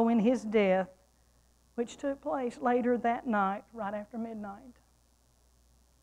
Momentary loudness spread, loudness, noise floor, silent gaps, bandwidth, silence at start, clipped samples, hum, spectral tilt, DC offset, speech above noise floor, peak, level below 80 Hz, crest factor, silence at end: 14 LU; -31 LUFS; -67 dBFS; none; 10.5 kHz; 0 s; under 0.1%; none; -7 dB/octave; under 0.1%; 36 dB; -16 dBFS; -66 dBFS; 18 dB; 1.3 s